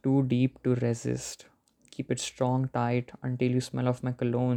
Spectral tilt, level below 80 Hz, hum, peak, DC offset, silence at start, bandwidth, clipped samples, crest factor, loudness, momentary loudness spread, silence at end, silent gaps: -6.5 dB/octave; -62 dBFS; none; -12 dBFS; under 0.1%; 0.05 s; 12 kHz; under 0.1%; 16 dB; -29 LUFS; 9 LU; 0 s; none